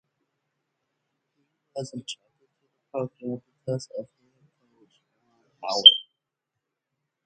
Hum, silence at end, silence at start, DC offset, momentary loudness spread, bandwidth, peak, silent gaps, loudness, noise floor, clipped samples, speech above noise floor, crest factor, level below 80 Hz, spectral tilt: none; 1.25 s; 1.75 s; under 0.1%; 25 LU; 9 kHz; 0 dBFS; none; -19 LUFS; -84 dBFS; under 0.1%; 61 dB; 28 dB; -78 dBFS; -3.5 dB/octave